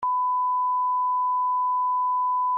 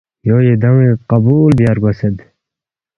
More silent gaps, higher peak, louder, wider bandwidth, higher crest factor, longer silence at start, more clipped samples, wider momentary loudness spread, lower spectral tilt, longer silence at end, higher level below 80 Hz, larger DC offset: neither; second, -20 dBFS vs 0 dBFS; second, -24 LUFS vs -12 LUFS; second, 1.7 kHz vs 5.6 kHz; second, 4 dB vs 12 dB; second, 0 s vs 0.25 s; neither; second, 0 LU vs 8 LU; second, 3 dB/octave vs -10.5 dB/octave; second, 0 s vs 0.8 s; second, -80 dBFS vs -40 dBFS; neither